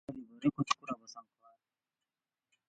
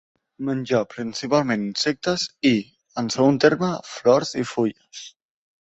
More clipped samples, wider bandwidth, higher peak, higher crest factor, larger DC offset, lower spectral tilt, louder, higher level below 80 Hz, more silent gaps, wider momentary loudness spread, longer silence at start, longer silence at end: neither; about the same, 9 kHz vs 8.2 kHz; second, -14 dBFS vs -4 dBFS; first, 28 dB vs 20 dB; neither; about the same, -5 dB/octave vs -5 dB/octave; second, -36 LUFS vs -22 LUFS; second, -74 dBFS vs -62 dBFS; neither; first, 19 LU vs 13 LU; second, 0.1 s vs 0.4 s; first, 1.45 s vs 0.6 s